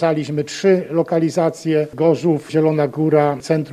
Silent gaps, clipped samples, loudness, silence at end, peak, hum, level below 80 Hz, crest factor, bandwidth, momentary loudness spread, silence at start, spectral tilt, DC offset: none; under 0.1%; -18 LUFS; 0 s; -2 dBFS; none; -62 dBFS; 14 dB; 13 kHz; 4 LU; 0 s; -7 dB/octave; under 0.1%